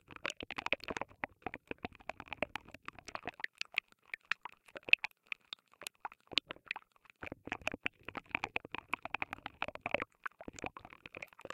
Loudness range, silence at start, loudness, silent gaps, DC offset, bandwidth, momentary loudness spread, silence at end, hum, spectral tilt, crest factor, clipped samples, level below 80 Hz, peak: 6 LU; 0.1 s; -40 LUFS; none; under 0.1%; 16.5 kHz; 13 LU; 0 s; none; -2.5 dB/octave; 36 dB; under 0.1%; -68 dBFS; -6 dBFS